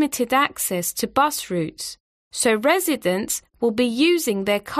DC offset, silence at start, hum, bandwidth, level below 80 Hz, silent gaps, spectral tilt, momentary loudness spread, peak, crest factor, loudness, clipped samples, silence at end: under 0.1%; 0 s; none; 15.5 kHz; -58 dBFS; 2.00-2.31 s; -3 dB/octave; 8 LU; -4 dBFS; 18 dB; -21 LUFS; under 0.1%; 0 s